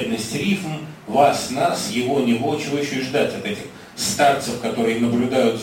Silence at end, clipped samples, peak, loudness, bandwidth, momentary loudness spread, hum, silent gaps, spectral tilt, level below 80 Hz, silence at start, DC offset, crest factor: 0 s; under 0.1%; -2 dBFS; -20 LUFS; 16.5 kHz; 10 LU; none; none; -4.5 dB/octave; -56 dBFS; 0 s; under 0.1%; 18 dB